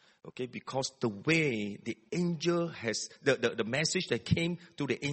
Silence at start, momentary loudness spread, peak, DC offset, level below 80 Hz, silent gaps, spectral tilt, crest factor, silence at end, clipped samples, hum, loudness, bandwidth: 0.25 s; 10 LU; -12 dBFS; under 0.1%; -60 dBFS; none; -4.5 dB/octave; 20 dB; 0 s; under 0.1%; none; -32 LUFS; 8.8 kHz